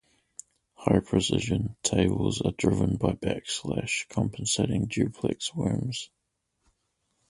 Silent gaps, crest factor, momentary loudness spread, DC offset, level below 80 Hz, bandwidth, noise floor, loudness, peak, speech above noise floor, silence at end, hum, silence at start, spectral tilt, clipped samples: none; 22 dB; 9 LU; under 0.1%; -46 dBFS; 11.5 kHz; -79 dBFS; -28 LUFS; -6 dBFS; 52 dB; 1.25 s; none; 0.8 s; -5 dB/octave; under 0.1%